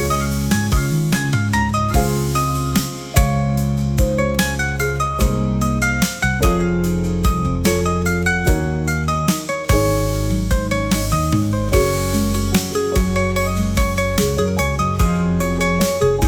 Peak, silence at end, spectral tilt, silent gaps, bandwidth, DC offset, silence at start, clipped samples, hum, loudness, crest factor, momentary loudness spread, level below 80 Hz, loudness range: -2 dBFS; 0 s; -5.5 dB/octave; none; over 20 kHz; under 0.1%; 0 s; under 0.1%; none; -18 LUFS; 16 dB; 2 LU; -24 dBFS; 1 LU